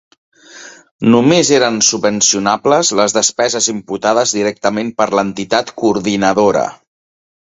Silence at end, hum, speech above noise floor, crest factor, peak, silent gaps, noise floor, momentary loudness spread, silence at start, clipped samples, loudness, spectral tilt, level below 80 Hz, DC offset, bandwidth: 0.7 s; none; 24 dB; 14 dB; 0 dBFS; 0.91-0.99 s; -37 dBFS; 7 LU; 0.55 s; under 0.1%; -13 LUFS; -3 dB/octave; -54 dBFS; under 0.1%; 8.4 kHz